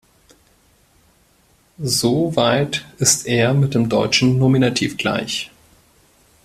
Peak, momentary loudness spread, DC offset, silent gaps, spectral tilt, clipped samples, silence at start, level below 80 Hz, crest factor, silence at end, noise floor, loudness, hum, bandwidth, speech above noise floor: -2 dBFS; 8 LU; under 0.1%; none; -4 dB/octave; under 0.1%; 1.8 s; -52 dBFS; 18 dB; 1 s; -57 dBFS; -17 LUFS; none; 16 kHz; 39 dB